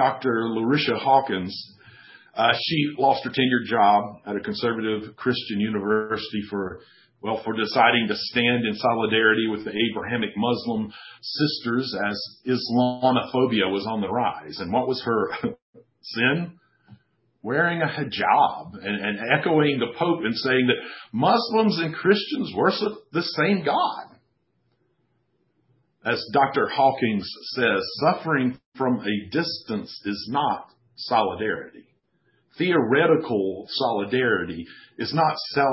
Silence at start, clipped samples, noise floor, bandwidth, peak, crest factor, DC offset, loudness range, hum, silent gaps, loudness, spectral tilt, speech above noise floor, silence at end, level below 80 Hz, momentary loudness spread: 0 s; under 0.1%; -70 dBFS; 5.8 kHz; -4 dBFS; 20 dB; under 0.1%; 5 LU; none; 15.62-15.73 s, 28.66-28.72 s; -23 LUFS; -9 dB/octave; 47 dB; 0 s; -60 dBFS; 11 LU